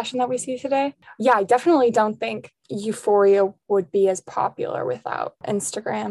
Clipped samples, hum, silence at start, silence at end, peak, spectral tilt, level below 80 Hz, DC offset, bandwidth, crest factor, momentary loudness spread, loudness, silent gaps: under 0.1%; none; 0 s; 0 s; -4 dBFS; -4.5 dB/octave; -70 dBFS; under 0.1%; 12.5 kHz; 18 dB; 11 LU; -22 LUFS; none